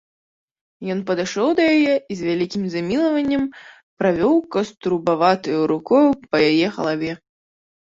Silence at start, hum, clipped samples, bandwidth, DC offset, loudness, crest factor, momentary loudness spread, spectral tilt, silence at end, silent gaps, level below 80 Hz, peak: 0.8 s; none; under 0.1%; 7.8 kHz; under 0.1%; -19 LUFS; 18 dB; 9 LU; -6 dB/octave; 0.75 s; 3.83-3.97 s; -58 dBFS; -2 dBFS